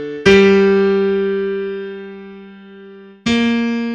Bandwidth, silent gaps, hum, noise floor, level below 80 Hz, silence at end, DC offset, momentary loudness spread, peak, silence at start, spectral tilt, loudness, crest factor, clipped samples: 8.6 kHz; none; none; -38 dBFS; -44 dBFS; 0 s; under 0.1%; 21 LU; 0 dBFS; 0 s; -6 dB/octave; -14 LUFS; 16 dB; under 0.1%